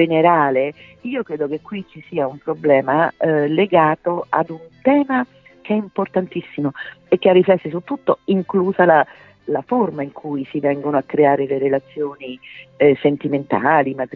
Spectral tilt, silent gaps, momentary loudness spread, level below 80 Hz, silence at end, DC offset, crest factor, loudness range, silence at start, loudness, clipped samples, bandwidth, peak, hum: -9.5 dB/octave; none; 13 LU; -62 dBFS; 0 s; under 0.1%; 16 dB; 3 LU; 0 s; -18 LUFS; under 0.1%; 4.7 kHz; -2 dBFS; none